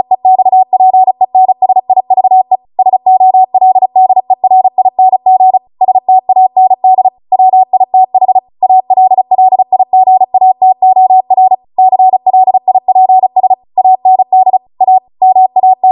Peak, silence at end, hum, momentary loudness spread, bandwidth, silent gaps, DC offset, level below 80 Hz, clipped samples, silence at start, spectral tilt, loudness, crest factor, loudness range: 0 dBFS; 0 s; none; 3 LU; 1.1 kHz; none; under 0.1%; -64 dBFS; under 0.1%; 0.1 s; -10 dB/octave; -8 LUFS; 6 dB; 1 LU